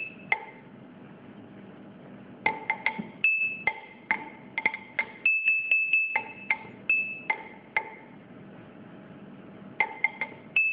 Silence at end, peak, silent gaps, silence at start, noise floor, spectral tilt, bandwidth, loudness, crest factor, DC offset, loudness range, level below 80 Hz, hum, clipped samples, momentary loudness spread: 0 s; -8 dBFS; none; 0 s; -48 dBFS; -7 dB/octave; 5 kHz; -27 LUFS; 22 dB; under 0.1%; 8 LU; -72 dBFS; none; under 0.1%; 25 LU